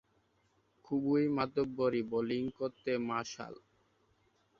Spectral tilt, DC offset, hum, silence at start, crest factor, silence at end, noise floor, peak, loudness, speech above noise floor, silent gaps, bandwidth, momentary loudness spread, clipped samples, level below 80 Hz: -6.5 dB/octave; under 0.1%; none; 0.9 s; 18 dB; 1.05 s; -74 dBFS; -18 dBFS; -35 LUFS; 40 dB; none; 7.4 kHz; 9 LU; under 0.1%; -70 dBFS